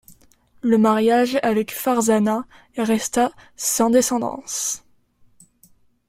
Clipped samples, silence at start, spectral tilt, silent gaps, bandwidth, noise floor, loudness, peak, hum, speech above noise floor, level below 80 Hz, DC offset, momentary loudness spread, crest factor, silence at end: under 0.1%; 0.1 s; -4 dB/octave; none; 16.5 kHz; -57 dBFS; -20 LUFS; -6 dBFS; none; 38 dB; -58 dBFS; under 0.1%; 9 LU; 16 dB; 1.3 s